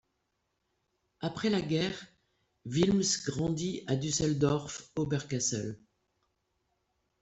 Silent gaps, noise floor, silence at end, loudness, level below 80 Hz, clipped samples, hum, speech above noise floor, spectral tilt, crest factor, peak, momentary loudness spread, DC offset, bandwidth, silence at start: none; -80 dBFS; 1.45 s; -31 LUFS; -60 dBFS; under 0.1%; none; 49 dB; -4.5 dB/octave; 20 dB; -14 dBFS; 11 LU; under 0.1%; 8.2 kHz; 1.2 s